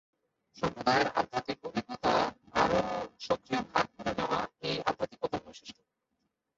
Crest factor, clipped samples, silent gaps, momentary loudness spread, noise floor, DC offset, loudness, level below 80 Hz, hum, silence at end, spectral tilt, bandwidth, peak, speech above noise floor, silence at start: 20 dB; under 0.1%; none; 9 LU; -81 dBFS; under 0.1%; -32 LUFS; -60 dBFS; none; 0.85 s; -4.5 dB/octave; 7.8 kHz; -12 dBFS; 51 dB; 0.55 s